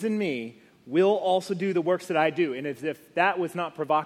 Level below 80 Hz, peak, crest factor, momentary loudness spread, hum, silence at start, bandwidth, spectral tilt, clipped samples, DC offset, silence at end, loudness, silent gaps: -76 dBFS; -8 dBFS; 18 dB; 9 LU; none; 0 s; 14.5 kHz; -6 dB/octave; under 0.1%; under 0.1%; 0 s; -26 LUFS; none